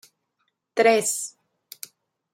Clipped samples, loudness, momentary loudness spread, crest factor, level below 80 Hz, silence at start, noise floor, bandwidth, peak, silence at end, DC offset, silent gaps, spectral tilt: under 0.1%; -22 LUFS; 22 LU; 20 dB; -84 dBFS; 0.75 s; -75 dBFS; 16.5 kHz; -6 dBFS; 1.05 s; under 0.1%; none; -2 dB/octave